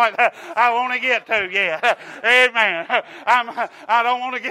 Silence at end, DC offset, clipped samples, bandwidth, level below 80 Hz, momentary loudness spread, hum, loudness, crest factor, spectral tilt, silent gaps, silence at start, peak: 0 s; under 0.1%; under 0.1%; 15.5 kHz; -70 dBFS; 8 LU; none; -18 LUFS; 16 dB; -1.5 dB/octave; none; 0 s; -2 dBFS